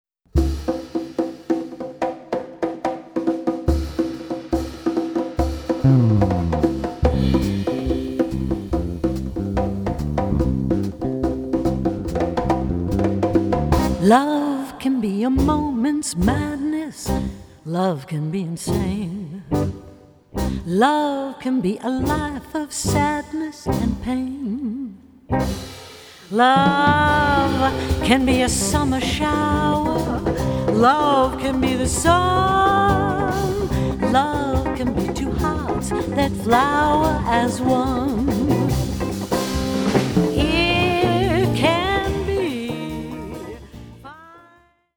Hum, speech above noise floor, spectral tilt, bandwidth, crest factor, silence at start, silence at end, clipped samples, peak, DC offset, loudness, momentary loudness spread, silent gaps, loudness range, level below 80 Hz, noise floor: none; 36 dB; -5.5 dB/octave; over 20 kHz; 20 dB; 0.35 s; 0.6 s; under 0.1%; 0 dBFS; under 0.1%; -20 LUFS; 11 LU; none; 7 LU; -32 dBFS; -55 dBFS